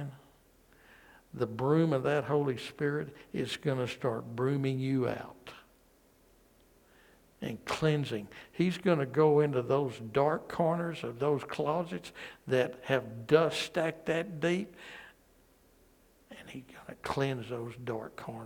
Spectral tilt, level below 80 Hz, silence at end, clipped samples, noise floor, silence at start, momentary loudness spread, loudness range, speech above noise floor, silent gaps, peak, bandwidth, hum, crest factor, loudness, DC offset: -6.5 dB/octave; -66 dBFS; 0 s; under 0.1%; -65 dBFS; 0 s; 18 LU; 8 LU; 33 dB; none; -10 dBFS; 18.5 kHz; none; 22 dB; -32 LUFS; under 0.1%